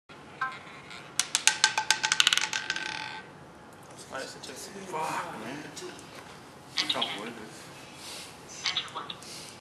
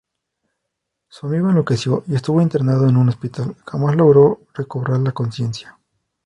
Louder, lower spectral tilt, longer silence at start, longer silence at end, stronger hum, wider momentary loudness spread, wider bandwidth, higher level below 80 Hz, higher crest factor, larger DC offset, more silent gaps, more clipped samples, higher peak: second, -29 LUFS vs -17 LUFS; second, 0 dB/octave vs -8.5 dB/octave; second, 0.1 s vs 1.25 s; second, 0 s vs 0.55 s; neither; first, 23 LU vs 14 LU; first, 13 kHz vs 9.8 kHz; second, -70 dBFS vs -54 dBFS; first, 34 dB vs 18 dB; neither; neither; neither; about the same, 0 dBFS vs 0 dBFS